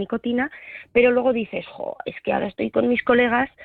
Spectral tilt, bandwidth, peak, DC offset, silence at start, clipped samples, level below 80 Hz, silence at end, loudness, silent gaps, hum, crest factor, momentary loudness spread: -8.5 dB/octave; 4.4 kHz; -6 dBFS; under 0.1%; 0 s; under 0.1%; -54 dBFS; 0 s; -22 LUFS; none; none; 16 dB; 13 LU